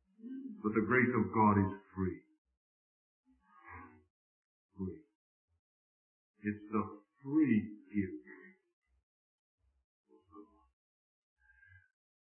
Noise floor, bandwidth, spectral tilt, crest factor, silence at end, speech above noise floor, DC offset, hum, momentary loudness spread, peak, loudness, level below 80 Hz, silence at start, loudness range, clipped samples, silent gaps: -64 dBFS; 3.1 kHz; -4 dB/octave; 22 dB; 1.8 s; 32 dB; under 0.1%; none; 23 LU; -16 dBFS; -34 LUFS; -72 dBFS; 0.25 s; 19 LU; under 0.1%; 2.38-2.45 s, 2.57-3.24 s, 4.10-4.69 s, 5.15-5.48 s, 5.59-6.34 s, 8.73-8.82 s, 9.03-9.58 s, 9.84-10.04 s